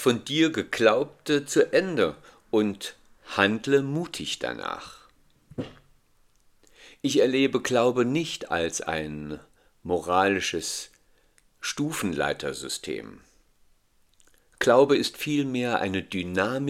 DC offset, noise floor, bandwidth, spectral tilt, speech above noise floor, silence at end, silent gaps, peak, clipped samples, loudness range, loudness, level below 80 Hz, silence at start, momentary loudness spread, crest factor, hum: under 0.1%; -63 dBFS; 16 kHz; -4 dB/octave; 38 dB; 0 s; none; -2 dBFS; under 0.1%; 7 LU; -25 LUFS; -60 dBFS; 0 s; 15 LU; 24 dB; none